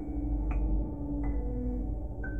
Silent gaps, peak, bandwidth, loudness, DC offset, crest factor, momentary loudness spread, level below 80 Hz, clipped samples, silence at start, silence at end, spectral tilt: none; -20 dBFS; 2.8 kHz; -35 LUFS; 0.4%; 12 dB; 4 LU; -32 dBFS; under 0.1%; 0 s; 0 s; -11.5 dB/octave